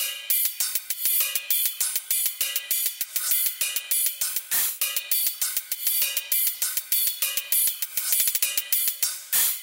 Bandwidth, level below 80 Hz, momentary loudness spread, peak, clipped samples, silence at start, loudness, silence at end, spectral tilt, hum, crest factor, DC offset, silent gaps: 17.5 kHz; -70 dBFS; 5 LU; -6 dBFS; under 0.1%; 0 s; -22 LUFS; 0 s; 4 dB/octave; none; 20 dB; under 0.1%; none